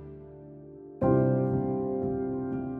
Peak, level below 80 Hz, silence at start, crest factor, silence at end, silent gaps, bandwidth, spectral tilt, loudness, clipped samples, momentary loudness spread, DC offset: -12 dBFS; -52 dBFS; 0 s; 18 dB; 0 s; none; 2.6 kHz; -13 dB/octave; -28 LUFS; under 0.1%; 22 LU; under 0.1%